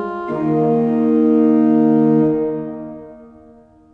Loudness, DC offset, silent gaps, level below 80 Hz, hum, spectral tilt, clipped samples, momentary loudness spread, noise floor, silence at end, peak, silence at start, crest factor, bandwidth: -15 LUFS; under 0.1%; none; -54 dBFS; none; -11 dB/octave; under 0.1%; 16 LU; -46 dBFS; 0.65 s; -4 dBFS; 0 s; 12 dB; 3.7 kHz